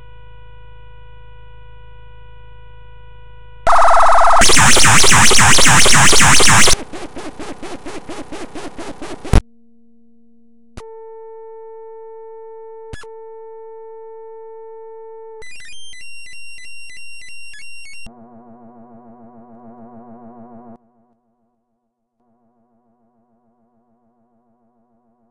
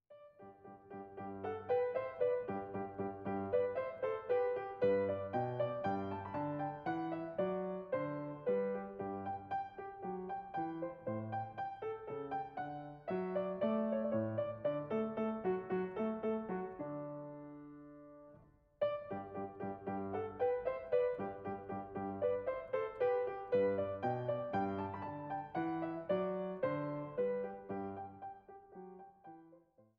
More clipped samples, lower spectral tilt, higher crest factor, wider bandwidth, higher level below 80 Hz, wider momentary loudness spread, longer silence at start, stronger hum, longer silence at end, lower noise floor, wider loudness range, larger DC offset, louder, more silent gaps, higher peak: first, 0.4% vs under 0.1%; second, -2 dB/octave vs -6.5 dB/octave; about the same, 16 dB vs 16 dB; first, over 20 kHz vs 5 kHz; first, -30 dBFS vs -72 dBFS; first, 28 LU vs 15 LU; about the same, 0 s vs 0.1 s; neither; first, 7.25 s vs 0.4 s; first, -71 dBFS vs -66 dBFS; first, 27 LU vs 5 LU; neither; first, -9 LUFS vs -40 LUFS; neither; first, 0 dBFS vs -22 dBFS